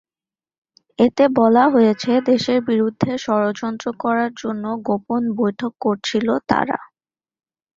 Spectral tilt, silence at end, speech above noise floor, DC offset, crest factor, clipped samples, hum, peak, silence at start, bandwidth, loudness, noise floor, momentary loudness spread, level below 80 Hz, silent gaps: -6 dB/octave; 0.9 s; over 72 dB; under 0.1%; 18 dB; under 0.1%; none; -2 dBFS; 1 s; 7.6 kHz; -19 LUFS; under -90 dBFS; 11 LU; -58 dBFS; none